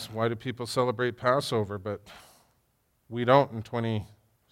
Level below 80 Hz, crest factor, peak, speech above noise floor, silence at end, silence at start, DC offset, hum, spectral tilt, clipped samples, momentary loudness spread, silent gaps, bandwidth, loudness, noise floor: -66 dBFS; 22 dB; -8 dBFS; 44 dB; 0.45 s; 0 s; under 0.1%; none; -6 dB/octave; under 0.1%; 14 LU; none; 16.5 kHz; -28 LUFS; -71 dBFS